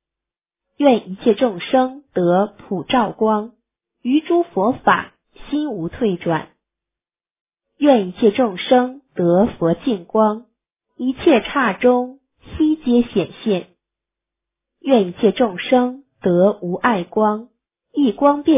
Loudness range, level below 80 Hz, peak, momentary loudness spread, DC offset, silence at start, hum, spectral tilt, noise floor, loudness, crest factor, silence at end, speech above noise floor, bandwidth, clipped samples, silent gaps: 3 LU; -52 dBFS; -2 dBFS; 9 LU; under 0.1%; 0.8 s; none; -10.5 dB/octave; under -90 dBFS; -18 LUFS; 16 dB; 0 s; over 73 dB; 3.8 kHz; under 0.1%; 7.40-7.46 s